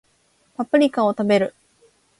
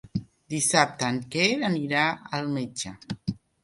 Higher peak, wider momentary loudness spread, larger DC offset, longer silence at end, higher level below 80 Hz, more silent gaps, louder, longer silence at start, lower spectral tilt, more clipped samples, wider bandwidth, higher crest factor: about the same, -4 dBFS vs -4 dBFS; about the same, 12 LU vs 13 LU; neither; first, 0.7 s vs 0.25 s; second, -68 dBFS vs -60 dBFS; neither; first, -20 LUFS vs -26 LUFS; first, 0.6 s vs 0.05 s; first, -6.5 dB/octave vs -3.5 dB/octave; neither; about the same, 11.5 kHz vs 11.5 kHz; second, 18 dB vs 24 dB